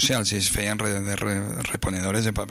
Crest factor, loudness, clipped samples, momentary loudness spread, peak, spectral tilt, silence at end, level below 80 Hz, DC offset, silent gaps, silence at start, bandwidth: 14 dB; -25 LUFS; under 0.1%; 5 LU; -10 dBFS; -3.5 dB/octave; 0 s; -42 dBFS; under 0.1%; none; 0 s; 15.5 kHz